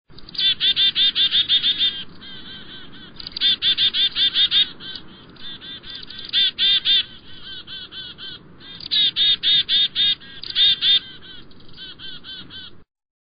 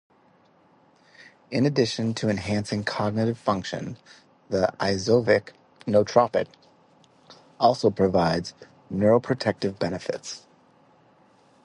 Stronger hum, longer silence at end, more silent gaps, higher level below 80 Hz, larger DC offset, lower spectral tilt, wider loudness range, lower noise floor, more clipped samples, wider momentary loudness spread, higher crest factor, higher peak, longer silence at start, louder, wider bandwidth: neither; second, 0.5 s vs 1.25 s; neither; about the same, -54 dBFS vs -54 dBFS; first, 0.4% vs under 0.1%; second, 2.5 dB/octave vs -6 dB/octave; about the same, 4 LU vs 3 LU; second, -41 dBFS vs -59 dBFS; neither; first, 21 LU vs 14 LU; second, 16 dB vs 22 dB; about the same, -6 dBFS vs -4 dBFS; second, 0.15 s vs 1.5 s; first, -16 LUFS vs -24 LUFS; second, 5.2 kHz vs 11 kHz